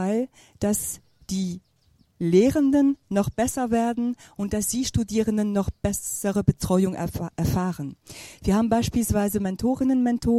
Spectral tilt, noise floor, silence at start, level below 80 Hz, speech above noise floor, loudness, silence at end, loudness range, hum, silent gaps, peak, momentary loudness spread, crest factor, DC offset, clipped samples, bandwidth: -6 dB/octave; -62 dBFS; 0 s; -42 dBFS; 39 dB; -24 LUFS; 0 s; 2 LU; none; none; -4 dBFS; 12 LU; 20 dB; under 0.1%; under 0.1%; 16 kHz